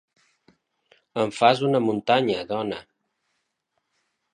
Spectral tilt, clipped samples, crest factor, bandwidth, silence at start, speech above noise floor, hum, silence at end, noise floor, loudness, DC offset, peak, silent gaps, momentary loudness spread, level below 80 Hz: -5.5 dB/octave; under 0.1%; 22 dB; 10.5 kHz; 1.15 s; 55 dB; none; 1.5 s; -77 dBFS; -23 LUFS; under 0.1%; -4 dBFS; none; 13 LU; -66 dBFS